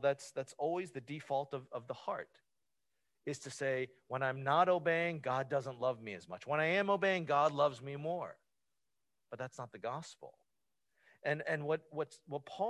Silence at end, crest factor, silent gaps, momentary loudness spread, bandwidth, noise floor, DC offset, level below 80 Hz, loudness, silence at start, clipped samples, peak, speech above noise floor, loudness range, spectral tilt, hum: 0 s; 22 dB; none; 14 LU; 12 kHz; under -90 dBFS; under 0.1%; -82 dBFS; -37 LUFS; 0 s; under 0.1%; -16 dBFS; over 53 dB; 9 LU; -5.5 dB/octave; none